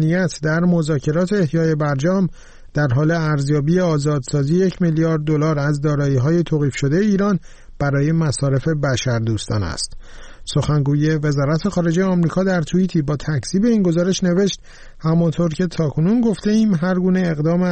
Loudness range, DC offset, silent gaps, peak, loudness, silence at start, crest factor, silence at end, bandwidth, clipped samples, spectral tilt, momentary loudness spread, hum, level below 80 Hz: 2 LU; 0.1%; none; -8 dBFS; -18 LUFS; 0 s; 10 dB; 0 s; 8.8 kHz; under 0.1%; -7 dB/octave; 5 LU; none; -40 dBFS